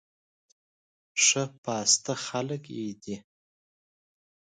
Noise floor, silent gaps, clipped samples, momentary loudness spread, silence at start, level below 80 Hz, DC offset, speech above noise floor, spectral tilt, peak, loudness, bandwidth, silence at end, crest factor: under -90 dBFS; 1.58-1.63 s; under 0.1%; 17 LU; 1.15 s; -76 dBFS; under 0.1%; over 61 dB; -1.5 dB/octave; -8 dBFS; -26 LUFS; 11 kHz; 1.2 s; 24 dB